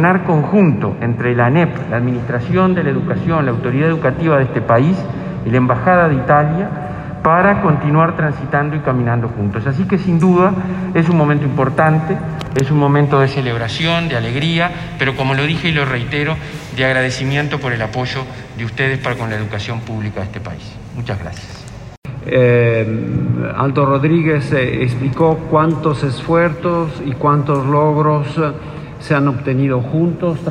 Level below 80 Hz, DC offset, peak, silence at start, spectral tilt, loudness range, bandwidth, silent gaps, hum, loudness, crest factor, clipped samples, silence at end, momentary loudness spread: -40 dBFS; under 0.1%; 0 dBFS; 0 s; -7.5 dB/octave; 5 LU; 9.8 kHz; 21.97-22.02 s; none; -15 LUFS; 14 dB; under 0.1%; 0 s; 11 LU